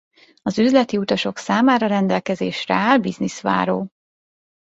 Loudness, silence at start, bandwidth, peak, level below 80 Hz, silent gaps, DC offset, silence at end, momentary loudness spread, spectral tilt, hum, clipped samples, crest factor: -19 LUFS; 0.45 s; 8 kHz; -2 dBFS; -60 dBFS; none; under 0.1%; 0.9 s; 9 LU; -5.5 dB/octave; none; under 0.1%; 18 dB